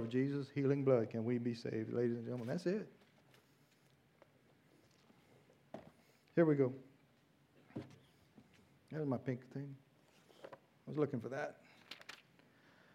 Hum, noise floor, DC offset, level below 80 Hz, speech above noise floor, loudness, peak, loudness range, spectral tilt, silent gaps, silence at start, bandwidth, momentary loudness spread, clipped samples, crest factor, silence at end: none; -72 dBFS; under 0.1%; -86 dBFS; 34 dB; -39 LUFS; -20 dBFS; 9 LU; -8.5 dB/octave; none; 0 s; 12 kHz; 23 LU; under 0.1%; 22 dB; 0.8 s